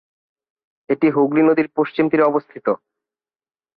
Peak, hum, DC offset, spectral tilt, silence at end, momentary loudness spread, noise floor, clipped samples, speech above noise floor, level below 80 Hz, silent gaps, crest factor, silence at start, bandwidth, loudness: -4 dBFS; none; under 0.1%; -10.5 dB/octave; 1 s; 8 LU; under -90 dBFS; under 0.1%; over 73 dB; -66 dBFS; none; 14 dB; 0.9 s; 4.8 kHz; -18 LUFS